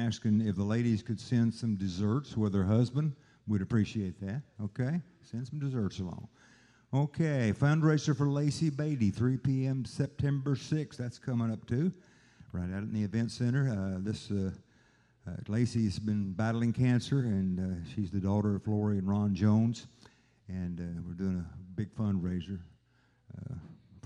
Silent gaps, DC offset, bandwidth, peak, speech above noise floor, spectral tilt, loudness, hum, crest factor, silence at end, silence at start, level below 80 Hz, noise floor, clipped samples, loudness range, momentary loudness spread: none; under 0.1%; 10.5 kHz; -14 dBFS; 38 dB; -7.5 dB/octave; -32 LUFS; none; 18 dB; 0.05 s; 0 s; -64 dBFS; -69 dBFS; under 0.1%; 6 LU; 12 LU